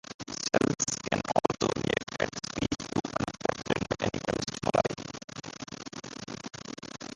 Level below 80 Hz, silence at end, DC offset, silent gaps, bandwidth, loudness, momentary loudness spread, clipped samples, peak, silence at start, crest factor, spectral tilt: -54 dBFS; 0 s; under 0.1%; 0.14-0.19 s, 5.24-5.28 s; 11.5 kHz; -32 LUFS; 13 LU; under 0.1%; -8 dBFS; 0.1 s; 24 dB; -4 dB/octave